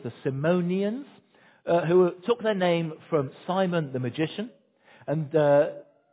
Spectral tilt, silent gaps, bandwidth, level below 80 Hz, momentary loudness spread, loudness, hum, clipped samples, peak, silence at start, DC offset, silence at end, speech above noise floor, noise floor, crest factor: -11 dB/octave; none; 4 kHz; -70 dBFS; 14 LU; -26 LUFS; none; under 0.1%; -10 dBFS; 0 s; under 0.1%; 0.3 s; 33 dB; -58 dBFS; 16 dB